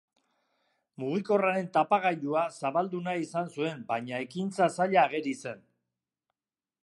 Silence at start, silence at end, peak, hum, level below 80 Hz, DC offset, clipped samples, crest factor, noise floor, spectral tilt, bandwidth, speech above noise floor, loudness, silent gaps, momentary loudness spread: 1 s; 1.25 s; -10 dBFS; none; -82 dBFS; under 0.1%; under 0.1%; 22 dB; under -90 dBFS; -6 dB/octave; 11.5 kHz; over 61 dB; -29 LUFS; none; 10 LU